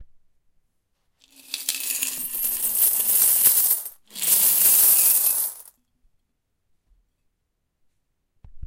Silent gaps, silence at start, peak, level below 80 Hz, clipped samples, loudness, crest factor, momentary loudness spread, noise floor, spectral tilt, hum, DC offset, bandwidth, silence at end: none; 0 s; -2 dBFS; -58 dBFS; under 0.1%; -17 LUFS; 22 dB; 13 LU; -75 dBFS; 1.5 dB/octave; none; under 0.1%; 17 kHz; 0 s